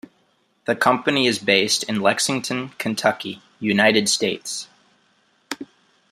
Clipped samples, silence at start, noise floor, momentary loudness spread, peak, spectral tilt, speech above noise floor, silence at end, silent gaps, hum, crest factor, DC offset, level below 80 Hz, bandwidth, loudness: under 0.1%; 0.7 s; -64 dBFS; 17 LU; -2 dBFS; -3 dB/octave; 43 dB; 0.45 s; none; none; 22 dB; under 0.1%; -66 dBFS; 15.5 kHz; -20 LUFS